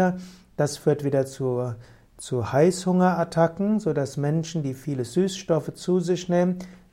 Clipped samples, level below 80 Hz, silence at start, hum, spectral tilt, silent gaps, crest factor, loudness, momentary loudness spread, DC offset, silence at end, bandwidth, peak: under 0.1%; -58 dBFS; 0 s; none; -6.5 dB/octave; none; 16 dB; -24 LUFS; 9 LU; under 0.1%; 0.2 s; 15.5 kHz; -8 dBFS